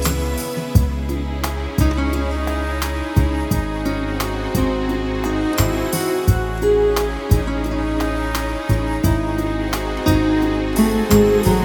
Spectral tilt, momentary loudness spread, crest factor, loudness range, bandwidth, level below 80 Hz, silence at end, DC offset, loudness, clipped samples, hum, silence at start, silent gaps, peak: -6 dB/octave; 6 LU; 16 dB; 2 LU; 19.5 kHz; -24 dBFS; 0 s; under 0.1%; -19 LUFS; under 0.1%; none; 0 s; none; -2 dBFS